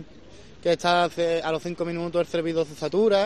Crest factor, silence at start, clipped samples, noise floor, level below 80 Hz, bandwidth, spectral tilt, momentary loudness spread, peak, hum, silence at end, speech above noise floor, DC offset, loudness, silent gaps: 18 dB; 0 s; under 0.1%; -48 dBFS; -58 dBFS; 13 kHz; -5 dB/octave; 7 LU; -8 dBFS; none; 0 s; 24 dB; 0.4%; -25 LUFS; none